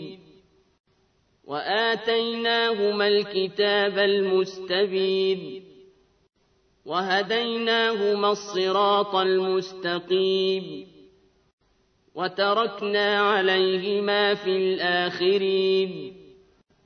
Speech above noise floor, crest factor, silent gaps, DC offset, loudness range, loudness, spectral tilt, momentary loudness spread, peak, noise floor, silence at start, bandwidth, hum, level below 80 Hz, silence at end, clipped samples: 43 dB; 16 dB; 0.80-0.84 s, 11.53-11.58 s; under 0.1%; 4 LU; -23 LUFS; -5 dB/octave; 9 LU; -8 dBFS; -66 dBFS; 0 s; 6.6 kHz; none; -72 dBFS; 0.65 s; under 0.1%